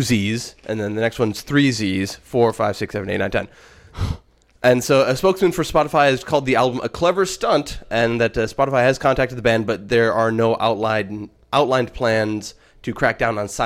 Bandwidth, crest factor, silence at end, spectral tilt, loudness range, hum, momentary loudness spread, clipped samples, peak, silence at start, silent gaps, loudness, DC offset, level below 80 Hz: 16.5 kHz; 16 dB; 0 s; -5 dB/octave; 3 LU; none; 10 LU; under 0.1%; -2 dBFS; 0 s; none; -19 LUFS; under 0.1%; -42 dBFS